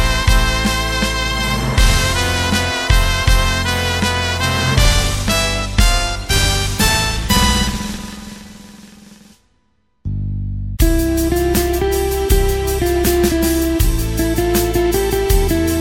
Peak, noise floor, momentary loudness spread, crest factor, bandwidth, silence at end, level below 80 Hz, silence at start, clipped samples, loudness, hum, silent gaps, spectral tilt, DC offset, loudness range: 0 dBFS; -63 dBFS; 9 LU; 16 dB; 17 kHz; 0 s; -20 dBFS; 0 s; under 0.1%; -16 LUFS; none; none; -4 dB/octave; under 0.1%; 6 LU